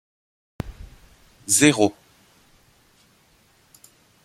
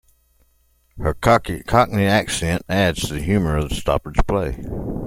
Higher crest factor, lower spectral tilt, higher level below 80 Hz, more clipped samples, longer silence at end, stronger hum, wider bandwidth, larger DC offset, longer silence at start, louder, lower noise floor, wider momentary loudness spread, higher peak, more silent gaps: first, 26 dB vs 18 dB; second, -3 dB/octave vs -5.5 dB/octave; second, -50 dBFS vs -32 dBFS; neither; first, 2.35 s vs 0 s; neither; about the same, 16 kHz vs 16.5 kHz; neither; second, 0.65 s vs 0.95 s; about the same, -18 LUFS vs -20 LUFS; about the same, -59 dBFS vs -60 dBFS; first, 21 LU vs 9 LU; about the same, -2 dBFS vs -2 dBFS; neither